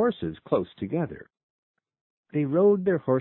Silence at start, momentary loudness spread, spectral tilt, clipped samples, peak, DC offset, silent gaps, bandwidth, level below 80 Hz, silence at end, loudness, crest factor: 0 s; 13 LU; -12 dB/octave; under 0.1%; -8 dBFS; under 0.1%; 1.43-1.74 s, 2.01-2.24 s; 4.1 kHz; -60 dBFS; 0 s; -26 LUFS; 18 dB